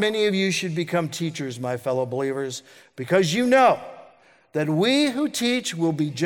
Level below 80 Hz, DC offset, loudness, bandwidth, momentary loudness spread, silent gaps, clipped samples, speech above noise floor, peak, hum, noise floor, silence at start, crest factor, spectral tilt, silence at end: -70 dBFS; under 0.1%; -23 LUFS; 18 kHz; 11 LU; none; under 0.1%; 31 dB; -6 dBFS; none; -54 dBFS; 0 s; 18 dB; -4.5 dB/octave; 0 s